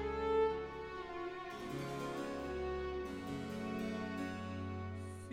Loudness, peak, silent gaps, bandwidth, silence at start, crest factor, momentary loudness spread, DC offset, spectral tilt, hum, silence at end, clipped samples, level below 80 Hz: -41 LUFS; -24 dBFS; none; 16 kHz; 0 s; 16 dB; 10 LU; under 0.1%; -6.5 dB/octave; none; 0 s; under 0.1%; -56 dBFS